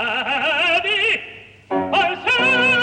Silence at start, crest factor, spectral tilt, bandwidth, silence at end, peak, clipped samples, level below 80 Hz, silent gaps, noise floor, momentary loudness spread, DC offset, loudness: 0 s; 12 dB; -3 dB/octave; 10.5 kHz; 0 s; -8 dBFS; under 0.1%; -56 dBFS; none; -39 dBFS; 10 LU; under 0.1%; -17 LUFS